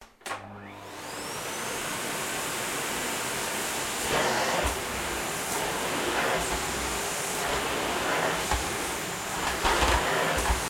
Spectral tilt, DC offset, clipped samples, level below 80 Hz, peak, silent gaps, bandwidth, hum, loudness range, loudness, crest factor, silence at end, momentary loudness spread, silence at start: -2.5 dB/octave; under 0.1%; under 0.1%; -42 dBFS; -10 dBFS; none; 16.5 kHz; none; 4 LU; -28 LUFS; 20 dB; 0 s; 10 LU; 0 s